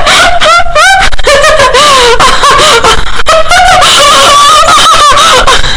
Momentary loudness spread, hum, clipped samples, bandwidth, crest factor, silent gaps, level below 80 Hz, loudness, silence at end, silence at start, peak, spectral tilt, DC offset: 4 LU; none; 20%; 12 kHz; 2 dB; none; -18 dBFS; -2 LUFS; 0 s; 0 s; 0 dBFS; -1 dB/octave; under 0.1%